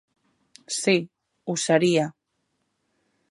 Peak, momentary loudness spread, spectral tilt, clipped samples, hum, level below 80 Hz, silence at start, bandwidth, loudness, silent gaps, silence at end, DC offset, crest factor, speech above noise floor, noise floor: -6 dBFS; 15 LU; -4 dB/octave; under 0.1%; none; -74 dBFS; 0.7 s; 11.5 kHz; -23 LUFS; none; 1.2 s; under 0.1%; 22 dB; 53 dB; -75 dBFS